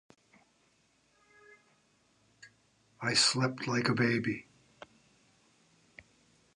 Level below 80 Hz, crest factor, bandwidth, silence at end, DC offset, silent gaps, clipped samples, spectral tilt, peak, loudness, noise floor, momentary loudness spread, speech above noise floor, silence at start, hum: -74 dBFS; 24 dB; 11 kHz; 2.15 s; under 0.1%; none; under 0.1%; -3.5 dB/octave; -14 dBFS; -30 LUFS; -71 dBFS; 12 LU; 41 dB; 2.45 s; none